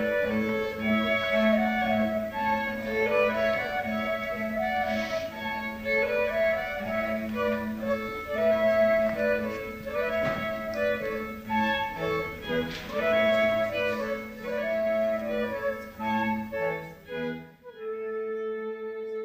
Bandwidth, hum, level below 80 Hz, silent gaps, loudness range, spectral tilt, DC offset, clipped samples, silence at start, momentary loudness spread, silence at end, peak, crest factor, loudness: 15.5 kHz; none; -52 dBFS; none; 4 LU; -5.5 dB/octave; under 0.1%; under 0.1%; 0 s; 10 LU; 0 s; -12 dBFS; 16 dB; -28 LUFS